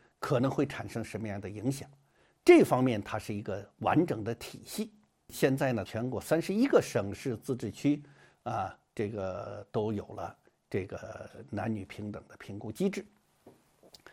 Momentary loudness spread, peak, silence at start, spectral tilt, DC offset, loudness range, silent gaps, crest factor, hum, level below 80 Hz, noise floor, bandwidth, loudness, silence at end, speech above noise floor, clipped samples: 16 LU; -8 dBFS; 0.2 s; -6.5 dB/octave; under 0.1%; 10 LU; none; 24 dB; none; -66 dBFS; -61 dBFS; 16.5 kHz; -31 LUFS; 0.6 s; 30 dB; under 0.1%